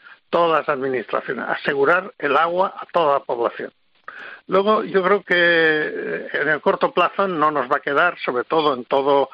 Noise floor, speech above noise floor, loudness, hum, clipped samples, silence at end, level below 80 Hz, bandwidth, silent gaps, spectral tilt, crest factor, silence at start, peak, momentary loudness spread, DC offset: -39 dBFS; 20 dB; -19 LUFS; none; under 0.1%; 0.05 s; -68 dBFS; 6 kHz; none; -6.5 dB/octave; 14 dB; 0.1 s; -6 dBFS; 8 LU; under 0.1%